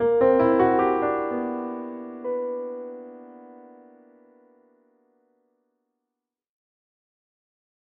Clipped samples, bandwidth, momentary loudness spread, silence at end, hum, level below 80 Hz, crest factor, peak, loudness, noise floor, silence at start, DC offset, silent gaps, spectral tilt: under 0.1%; 4.4 kHz; 24 LU; 4.35 s; none; -60 dBFS; 20 dB; -8 dBFS; -24 LUFS; -86 dBFS; 0 s; under 0.1%; none; -6 dB/octave